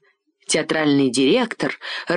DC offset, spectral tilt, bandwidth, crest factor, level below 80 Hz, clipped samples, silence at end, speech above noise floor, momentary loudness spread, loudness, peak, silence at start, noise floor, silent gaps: under 0.1%; -4 dB/octave; 10.5 kHz; 14 dB; -64 dBFS; under 0.1%; 0 s; 24 dB; 10 LU; -19 LUFS; -6 dBFS; 0.5 s; -43 dBFS; none